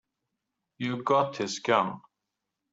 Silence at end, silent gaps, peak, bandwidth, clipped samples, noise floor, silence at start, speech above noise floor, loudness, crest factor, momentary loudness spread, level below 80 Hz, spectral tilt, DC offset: 0.75 s; none; -8 dBFS; 8 kHz; under 0.1%; -85 dBFS; 0.8 s; 58 dB; -28 LUFS; 24 dB; 9 LU; -76 dBFS; -4.5 dB/octave; under 0.1%